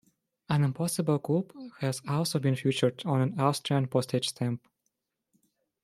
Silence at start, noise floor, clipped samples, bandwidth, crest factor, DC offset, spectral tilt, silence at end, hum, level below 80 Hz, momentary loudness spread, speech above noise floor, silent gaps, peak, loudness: 0.5 s; -81 dBFS; under 0.1%; 15 kHz; 20 dB; under 0.1%; -6 dB/octave; 1.25 s; none; -68 dBFS; 7 LU; 53 dB; none; -10 dBFS; -29 LUFS